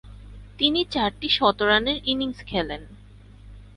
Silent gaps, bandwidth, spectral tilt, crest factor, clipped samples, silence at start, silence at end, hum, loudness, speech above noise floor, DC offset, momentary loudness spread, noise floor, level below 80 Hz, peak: none; 11 kHz; -5 dB/octave; 20 dB; under 0.1%; 0.05 s; 0.1 s; 50 Hz at -45 dBFS; -22 LUFS; 23 dB; under 0.1%; 9 LU; -46 dBFS; -44 dBFS; -4 dBFS